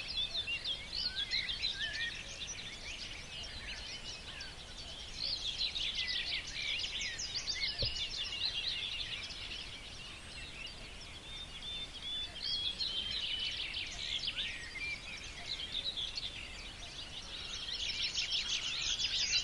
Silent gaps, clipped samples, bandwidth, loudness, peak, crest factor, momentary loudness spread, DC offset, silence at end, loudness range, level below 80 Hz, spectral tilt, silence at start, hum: none; under 0.1%; 11.5 kHz; -37 LUFS; -20 dBFS; 20 dB; 11 LU; under 0.1%; 0 s; 6 LU; -54 dBFS; -0.5 dB/octave; 0 s; none